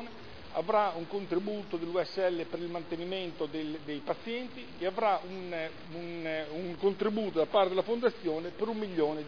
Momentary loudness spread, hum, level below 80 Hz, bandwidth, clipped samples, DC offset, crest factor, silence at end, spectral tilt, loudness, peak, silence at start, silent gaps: 10 LU; none; -66 dBFS; 5.4 kHz; under 0.1%; 0.4%; 20 dB; 0 s; -4 dB/octave; -33 LUFS; -14 dBFS; 0 s; none